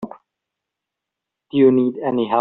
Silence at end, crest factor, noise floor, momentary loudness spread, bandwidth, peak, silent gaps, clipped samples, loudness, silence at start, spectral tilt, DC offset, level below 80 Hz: 0 s; 18 dB; -83 dBFS; 11 LU; 4.1 kHz; -4 dBFS; none; under 0.1%; -17 LUFS; 0 s; -6.5 dB/octave; under 0.1%; -66 dBFS